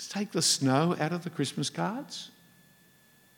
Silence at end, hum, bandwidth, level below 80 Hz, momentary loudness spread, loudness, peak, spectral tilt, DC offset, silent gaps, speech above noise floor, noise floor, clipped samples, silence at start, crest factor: 1.1 s; none; 18 kHz; -80 dBFS; 16 LU; -29 LUFS; -10 dBFS; -4 dB/octave; under 0.1%; none; 32 dB; -61 dBFS; under 0.1%; 0 s; 20 dB